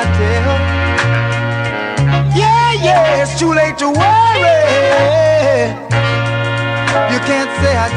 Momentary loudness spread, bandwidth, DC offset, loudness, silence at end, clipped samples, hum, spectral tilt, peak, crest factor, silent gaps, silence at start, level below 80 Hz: 6 LU; 11.5 kHz; under 0.1%; -12 LUFS; 0 s; under 0.1%; none; -5.5 dB/octave; 0 dBFS; 12 dB; none; 0 s; -32 dBFS